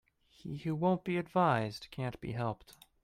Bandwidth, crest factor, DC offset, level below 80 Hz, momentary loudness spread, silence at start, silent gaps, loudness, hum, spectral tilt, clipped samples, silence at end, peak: 15 kHz; 20 dB; under 0.1%; -64 dBFS; 14 LU; 0.45 s; none; -34 LUFS; none; -7.5 dB/octave; under 0.1%; 0.3 s; -16 dBFS